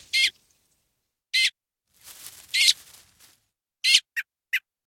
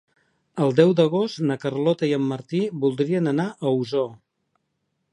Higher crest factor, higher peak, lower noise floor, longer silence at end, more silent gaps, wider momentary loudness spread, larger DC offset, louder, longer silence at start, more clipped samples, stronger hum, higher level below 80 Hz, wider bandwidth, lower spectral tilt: about the same, 24 dB vs 20 dB; about the same, -4 dBFS vs -2 dBFS; about the same, -78 dBFS vs -75 dBFS; second, 0.3 s vs 0.95 s; neither; first, 18 LU vs 8 LU; neither; about the same, -22 LUFS vs -22 LUFS; second, 0.15 s vs 0.55 s; neither; neither; about the same, -74 dBFS vs -72 dBFS; first, 17 kHz vs 10.5 kHz; second, 5 dB/octave vs -7.5 dB/octave